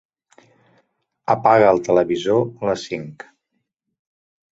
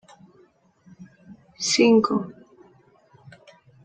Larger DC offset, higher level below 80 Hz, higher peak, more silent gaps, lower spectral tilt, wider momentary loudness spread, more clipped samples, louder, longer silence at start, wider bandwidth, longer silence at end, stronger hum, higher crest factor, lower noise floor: neither; first, -58 dBFS vs -68 dBFS; first, -2 dBFS vs -6 dBFS; neither; first, -6 dB/octave vs -3.5 dB/octave; first, 16 LU vs 13 LU; neither; about the same, -18 LUFS vs -20 LUFS; first, 1.3 s vs 1 s; second, 8 kHz vs 9.4 kHz; second, 1.4 s vs 1.55 s; neither; about the same, 20 dB vs 20 dB; first, -75 dBFS vs -59 dBFS